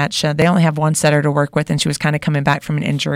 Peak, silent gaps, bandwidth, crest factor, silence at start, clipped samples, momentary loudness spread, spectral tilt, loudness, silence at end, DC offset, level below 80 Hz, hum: -4 dBFS; none; 15.5 kHz; 12 dB; 0 s; under 0.1%; 4 LU; -5 dB/octave; -16 LUFS; 0 s; under 0.1%; -48 dBFS; none